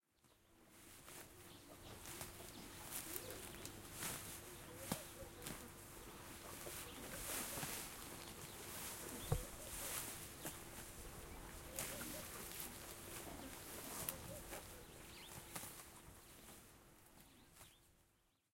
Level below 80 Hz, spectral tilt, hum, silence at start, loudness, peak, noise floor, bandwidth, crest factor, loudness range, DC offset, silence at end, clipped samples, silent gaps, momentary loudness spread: -64 dBFS; -3 dB/octave; none; 0.25 s; -50 LUFS; -22 dBFS; -79 dBFS; 16.5 kHz; 30 dB; 7 LU; under 0.1%; 0.4 s; under 0.1%; none; 15 LU